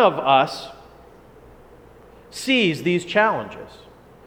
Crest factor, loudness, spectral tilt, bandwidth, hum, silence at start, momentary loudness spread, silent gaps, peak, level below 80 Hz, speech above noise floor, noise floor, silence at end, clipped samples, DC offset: 20 dB; -20 LUFS; -4.5 dB/octave; 18 kHz; none; 0 s; 21 LU; none; -2 dBFS; -56 dBFS; 27 dB; -47 dBFS; 0.55 s; under 0.1%; under 0.1%